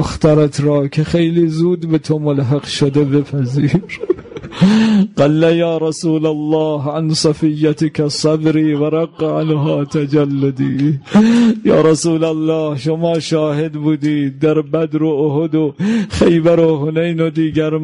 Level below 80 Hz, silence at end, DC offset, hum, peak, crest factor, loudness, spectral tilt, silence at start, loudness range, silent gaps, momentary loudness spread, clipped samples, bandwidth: -42 dBFS; 0 s; under 0.1%; none; -2 dBFS; 12 dB; -14 LUFS; -7 dB/octave; 0 s; 2 LU; none; 6 LU; under 0.1%; 11 kHz